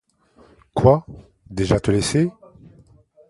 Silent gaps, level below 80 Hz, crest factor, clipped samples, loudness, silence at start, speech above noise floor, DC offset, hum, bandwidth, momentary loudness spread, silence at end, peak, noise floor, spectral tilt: none; -40 dBFS; 22 dB; under 0.1%; -20 LUFS; 0.75 s; 36 dB; under 0.1%; none; 11.5 kHz; 11 LU; 1 s; 0 dBFS; -54 dBFS; -6 dB/octave